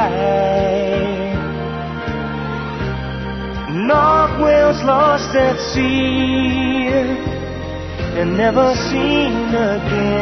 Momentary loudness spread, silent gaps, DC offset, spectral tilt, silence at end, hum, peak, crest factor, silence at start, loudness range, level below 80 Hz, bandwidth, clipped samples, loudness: 11 LU; none; 0.1%; -6 dB/octave; 0 s; none; -2 dBFS; 16 dB; 0 s; 5 LU; -32 dBFS; 6.4 kHz; under 0.1%; -17 LUFS